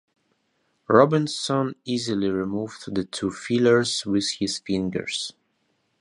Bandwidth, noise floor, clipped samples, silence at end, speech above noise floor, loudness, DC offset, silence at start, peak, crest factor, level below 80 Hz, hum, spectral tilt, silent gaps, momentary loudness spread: 11 kHz; -71 dBFS; under 0.1%; 0.7 s; 48 dB; -24 LUFS; under 0.1%; 0.9 s; -2 dBFS; 22 dB; -58 dBFS; none; -5 dB/octave; none; 11 LU